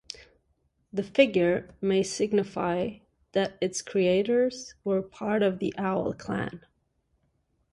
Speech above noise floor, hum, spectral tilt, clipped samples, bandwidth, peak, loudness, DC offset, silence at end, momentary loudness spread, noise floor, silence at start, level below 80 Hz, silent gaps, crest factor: 46 dB; none; -5 dB/octave; under 0.1%; 11.5 kHz; -6 dBFS; -27 LUFS; under 0.1%; 1.15 s; 11 LU; -73 dBFS; 0.95 s; -62 dBFS; none; 22 dB